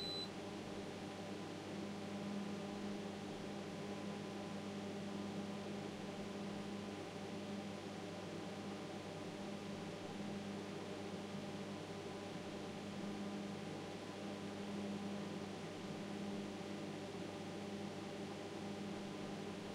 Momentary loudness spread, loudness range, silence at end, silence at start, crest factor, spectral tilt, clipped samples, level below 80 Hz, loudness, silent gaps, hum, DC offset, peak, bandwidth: 2 LU; 1 LU; 0 s; 0 s; 14 dB; -5.5 dB/octave; under 0.1%; -76 dBFS; -47 LUFS; none; none; under 0.1%; -34 dBFS; 15.5 kHz